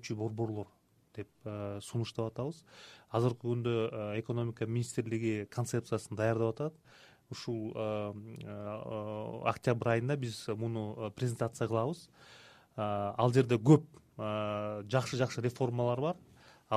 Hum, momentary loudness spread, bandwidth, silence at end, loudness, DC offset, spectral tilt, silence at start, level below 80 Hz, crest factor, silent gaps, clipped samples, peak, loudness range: none; 15 LU; 13.5 kHz; 0 s; -35 LUFS; under 0.1%; -7 dB/octave; 0 s; -68 dBFS; 24 dB; none; under 0.1%; -12 dBFS; 6 LU